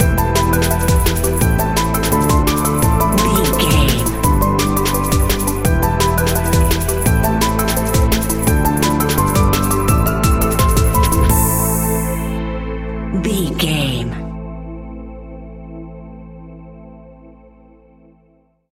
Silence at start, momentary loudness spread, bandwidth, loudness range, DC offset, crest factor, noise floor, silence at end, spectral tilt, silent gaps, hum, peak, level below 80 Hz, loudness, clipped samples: 0 s; 17 LU; 17 kHz; 9 LU; under 0.1%; 16 dB; -55 dBFS; 1.45 s; -5 dB/octave; none; none; 0 dBFS; -22 dBFS; -15 LUFS; under 0.1%